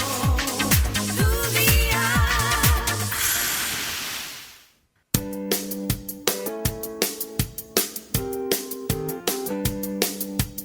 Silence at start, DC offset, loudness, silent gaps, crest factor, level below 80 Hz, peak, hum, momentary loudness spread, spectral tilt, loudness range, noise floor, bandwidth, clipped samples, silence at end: 0 s; under 0.1%; -23 LUFS; none; 24 dB; -32 dBFS; 0 dBFS; none; 9 LU; -3.5 dB/octave; 7 LU; -61 dBFS; over 20 kHz; under 0.1%; 0 s